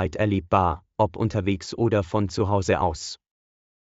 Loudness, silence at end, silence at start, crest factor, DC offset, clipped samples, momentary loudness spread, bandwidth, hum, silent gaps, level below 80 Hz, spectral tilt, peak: -24 LUFS; 0.75 s; 0 s; 18 dB; under 0.1%; under 0.1%; 6 LU; 8 kHz; none; none; -44 dBFS; -6 dB/octave; -6 dBFS